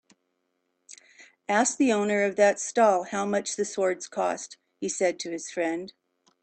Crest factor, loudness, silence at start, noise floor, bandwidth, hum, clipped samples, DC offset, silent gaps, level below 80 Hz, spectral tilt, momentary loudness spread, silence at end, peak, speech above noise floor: 18 dB; -26 LUFS; 0.9 s; -76 dBFS; 9.2 kHz; none; under 0.1%; under 0.1%; none; -74 dBFS; -3.5 dB/octave; 13 LU; 0.5 s; -8 dBFS; 51 dB